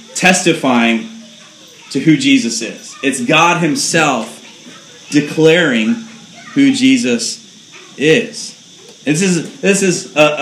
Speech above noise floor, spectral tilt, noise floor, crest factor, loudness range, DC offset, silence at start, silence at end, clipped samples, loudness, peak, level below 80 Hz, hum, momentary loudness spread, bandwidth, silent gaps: 27 dB; -4 dB/octave; -39 dBFS; 14 dB; 2 LU; under 0.1%; 0.1 s; 0 s; under 0.1%; -13 LUFS; 0 dBFS; -64 dBFS; none; 14 LU; 14.5 kHz; none